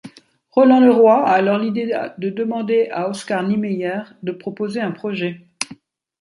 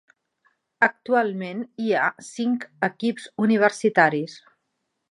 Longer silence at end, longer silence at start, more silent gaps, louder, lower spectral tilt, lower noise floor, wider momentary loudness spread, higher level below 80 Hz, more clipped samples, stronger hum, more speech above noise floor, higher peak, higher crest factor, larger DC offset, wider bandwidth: second, 0.45 s vs 0.75 s; second, 0.05 s vs 0.8 s; neither; first, -18 LUFS vs -23 LUFS; about the same, -6 dB/octave vs -5.5 dB/octave; second, -48 dBFS vs -77 dBFS; first, 16 LU vs 10 LU; first, -68 dBFS vs -74 dBFS; neither; neither; second, 31 dB vs 54 dB; about the same, -2 dBFS vs -2 dBFS; second, 16 dB vs 22 dB; neither; about the same, 11.5 kHz vs 11 kHz